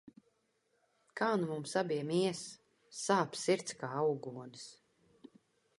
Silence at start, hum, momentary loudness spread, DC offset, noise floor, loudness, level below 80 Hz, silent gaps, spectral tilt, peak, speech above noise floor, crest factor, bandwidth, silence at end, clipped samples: 0.05 s; none; 17 LU; under 0.1%; -78 dBFS; -35 LUFS; -82 dBFS; none; -4.5 dB/octave; -16 dBFS; 43 dB; 22 dB; 11.5 kHz; 1.05 s; under 0.1%